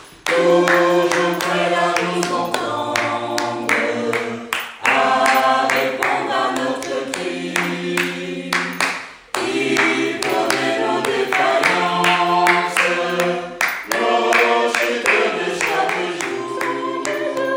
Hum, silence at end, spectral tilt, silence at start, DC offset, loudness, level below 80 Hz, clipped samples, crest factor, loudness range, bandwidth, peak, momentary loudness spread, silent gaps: none; 0 s; -3.5 dB/octave; 0 s; under 0.1%; -18 LUFS; -62 dBFS; under 0.1%; 18 dB; 4 LU; 17 kHz; 0 dBFS; 8 LU; none